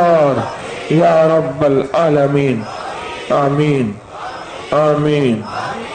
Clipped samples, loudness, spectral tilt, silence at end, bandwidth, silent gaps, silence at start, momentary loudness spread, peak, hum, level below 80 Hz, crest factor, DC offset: under 0.1%; -15 LUFS; -7 dB/octave; 0 s; 9.4 kHz; none; 0 s; 13 LU; -4 dBFS; none; -48 dBFS; 12 dB; under 0.1%